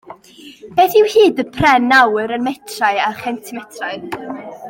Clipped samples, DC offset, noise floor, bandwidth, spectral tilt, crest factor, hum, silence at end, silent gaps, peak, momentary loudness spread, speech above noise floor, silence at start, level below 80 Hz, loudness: under 0.1%; under 0.1%; -41 dBFS; 17 kHz; -4.5 dB/octave; 16 dB; none; 0 s; none; 0 dBFS; 16 LU; 26 dB; 0.1 s; -50 dBFS; -14 LUFS